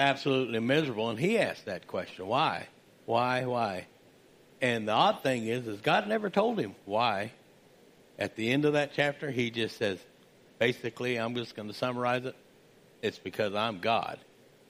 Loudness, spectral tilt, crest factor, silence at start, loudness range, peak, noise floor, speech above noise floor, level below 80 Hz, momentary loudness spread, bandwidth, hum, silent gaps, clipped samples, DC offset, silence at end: -30 LUFS; -5.5 dB/octave; 20 dB; 0 s; 4 LU; -10 dBFS; -59 dBFS; 29 dB; -74 dBFS; 10 LU; 15.5 kHz; none; none; under 0.1%; under 0.1%; 0.5 s